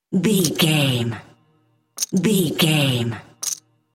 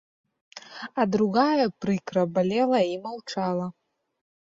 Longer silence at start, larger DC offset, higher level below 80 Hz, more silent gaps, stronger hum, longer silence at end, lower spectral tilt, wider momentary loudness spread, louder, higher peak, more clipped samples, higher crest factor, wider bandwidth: second, 0.1 s vs 0.55 s; neither; first, -60 dBFS vs -66 dBFS; neither; neither; second, 0.4 s vs 0.9 s; second, -4.5 dB/octave vs -6.5 dB/octave; second, 11 LU vs 14 LU; first, -20 LUFS vs -25 LUFS; first, 0 dBFS vs -8 dBFS; neither; about the same, 20 dB vs 18 dB; first, 17 kHz vs 7.8 kHz